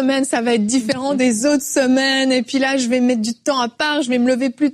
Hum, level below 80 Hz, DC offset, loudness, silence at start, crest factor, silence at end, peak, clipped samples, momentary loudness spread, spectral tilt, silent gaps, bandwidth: none; -60 dBFS; under 0.1%; -17 LUFS; 0 s; 12 dB; 0 s; -6 dBFS; under 0.1%; 4 LU; -3 dB/octave; none; 13.5 kHz